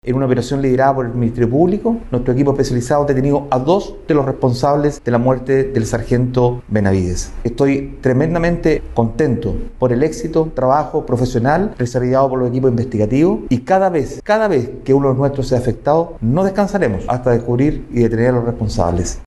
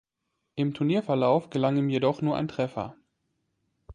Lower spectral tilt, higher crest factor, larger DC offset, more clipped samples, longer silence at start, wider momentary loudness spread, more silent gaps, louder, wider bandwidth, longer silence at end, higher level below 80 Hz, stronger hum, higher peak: about the same, -7.5 dB/octave vs -8 dB/octave; about the same, 14 dB vs 18 dB; neither; neither; second, 0.05 s vs 0.55 s; second, 4 LU vs 9 LU; neither; first, -16 LUFS vs -27 LUFS; first, 12 kHz vs 9.8 kHz; about the same, 0 s vs 0 s; first, -32 dBFS vs -60 dBFS; neither; first, -2 dBFS vs -10 dBFS